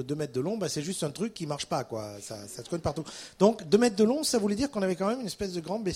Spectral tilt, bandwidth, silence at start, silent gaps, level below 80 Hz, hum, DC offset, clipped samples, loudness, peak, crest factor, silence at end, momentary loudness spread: -5 dB/octave; 16 kHz; 0 s; none; -58 dBFS; none; under 0.1%; under 0.1%; -29 LUFS; -8 dBFS; 22 dB; 0 s; 13 LU